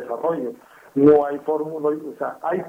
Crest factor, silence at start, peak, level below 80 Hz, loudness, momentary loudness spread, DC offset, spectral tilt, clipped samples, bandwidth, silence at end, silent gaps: 18 dB; 0 s; -4 dBFS; -60 dBFS; -21 LUFS; 14 LU; under 0.1%; -9 dB/octave; under 0.1%; 3.7 kHz; 0 s; none